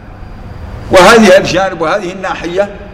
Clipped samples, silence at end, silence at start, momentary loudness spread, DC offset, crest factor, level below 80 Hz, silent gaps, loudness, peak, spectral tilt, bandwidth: 1%; 0 s; 0 s; 23 LU; under 0.1%; 10 dB; -30 dBFS; none; -8 LUFS; 0 dBFS; -4.5 dB/octave; 16.5 kHz